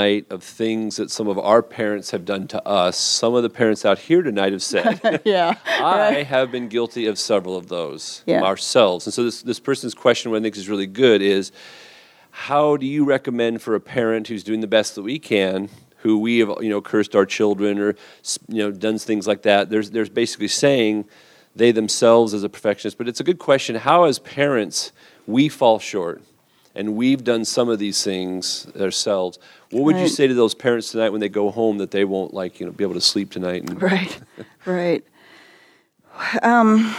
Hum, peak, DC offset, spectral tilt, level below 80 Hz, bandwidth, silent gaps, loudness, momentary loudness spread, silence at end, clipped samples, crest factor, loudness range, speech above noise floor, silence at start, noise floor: none; 0 dBFS; under 0.1%; -4 dB/octave; -70 dBFS; 15.5 kHz; none; -20 LUFS; 10 LU; 0 s; under 0.1%; 18 dB; 3 LU; 36 dB; 0 s; -55 dBFS